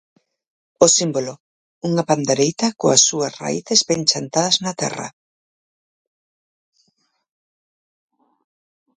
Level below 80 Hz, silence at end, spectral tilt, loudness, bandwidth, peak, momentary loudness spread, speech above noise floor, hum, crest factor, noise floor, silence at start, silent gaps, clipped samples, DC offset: -64 dBFS; 3.9 s; -3 dB/octave; -17 LUFS; 11 kHz; 0 dBFS; 12 LU; 49 dB; none; 22 dB; -68 dBFS; 0.8 s; 1.40-1.82 s; under 0.1%; under 0.1%